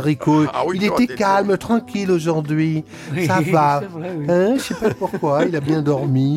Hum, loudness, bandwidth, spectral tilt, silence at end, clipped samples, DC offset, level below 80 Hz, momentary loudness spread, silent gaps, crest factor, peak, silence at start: none; -19 LUFS; 16 kHz; -7 dB/octave; 0 s; under 0.1%; under 0.1%; -52 dBFS; 6 LU; none; 14 dB; -4 dBFS; 0 s